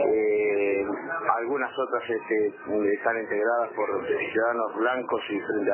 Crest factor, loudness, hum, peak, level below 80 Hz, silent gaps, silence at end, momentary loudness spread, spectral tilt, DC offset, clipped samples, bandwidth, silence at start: 16 dB; -26 LUFS; none; -10 dBFS; -68 dBFS; none; 0 s; 5 LU; -8.5 dB/octave; under 0.1%; under 0.1%; 3.2 kHz; 0 s